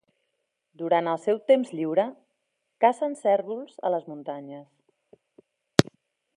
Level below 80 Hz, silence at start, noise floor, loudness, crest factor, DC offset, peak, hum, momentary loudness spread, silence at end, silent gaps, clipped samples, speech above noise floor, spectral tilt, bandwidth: -62 dBFS; 0.8 s; -78 dBFS; -26 LUFS; 28 dB; under 0.1%; 0 dBFS; none; 14 LU; 0.55 s; none; under 0.1%; 53 dB; -5.5 dB/octave; 13 kHz